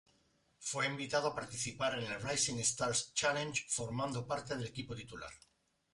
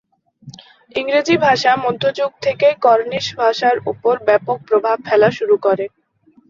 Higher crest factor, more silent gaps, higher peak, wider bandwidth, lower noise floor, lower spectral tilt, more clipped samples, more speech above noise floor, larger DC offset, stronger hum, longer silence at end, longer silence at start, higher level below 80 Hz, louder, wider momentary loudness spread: about the same, 20 dB vs 16 dB; neither; second, -20 dBFS vs 0 dBFS; first, 11.5 kHz vs 7.6 kHz; first, -74 dBFS vs -54 dBFS; second, -2.5 dB/octave vs -4.5 dB/octave; neither; about the same, 36 dB vs 38 dB; neither; neither; about the same, 0.55 s vs 0.65 s; first, 0.6 s vs 0.45 s; second, -66 dBFS vs -60 dBFS; second, -37 LUFS vs -16 LUFS; first, 12 LU vs 6 LU